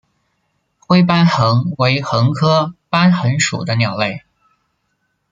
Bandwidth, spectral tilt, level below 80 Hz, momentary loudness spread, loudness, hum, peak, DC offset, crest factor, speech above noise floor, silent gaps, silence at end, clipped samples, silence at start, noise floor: 9.4 kHz; -5.5 dB/octave; -54 dBFS; 6 LU; -15 LUFS; none; 0 dBFS; under 0.1%; 16 dB; 54 dB; none; 1.15 s; under 0.1%; 0.9 s; -68 dBFS